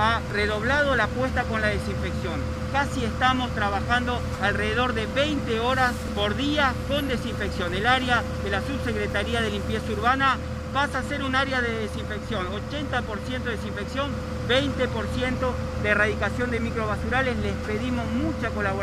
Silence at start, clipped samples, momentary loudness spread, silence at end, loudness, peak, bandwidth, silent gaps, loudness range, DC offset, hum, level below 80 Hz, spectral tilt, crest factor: 0 s; under 0.1%; 7 LU; 0 s; -25 LUFS; -6 dBFS; 15 kHz; none; 3 LU; under 0.1%; none; -36 dBFS; -5.5 dB/octave; 18 dB